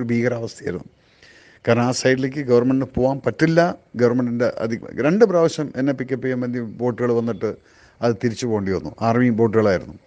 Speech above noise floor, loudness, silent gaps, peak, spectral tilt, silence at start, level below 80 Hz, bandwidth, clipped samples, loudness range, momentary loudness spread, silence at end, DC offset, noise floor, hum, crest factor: 30 dB; -20 LUFS; none; 0 dBFS; -6.5 dB/octave; 0 s; -52 dBFS; 9.4 kHz; under 0.1%; 4 LU; 9 LU; 0.1 s; under 0.1%; -50 dBFS; none; 20 dB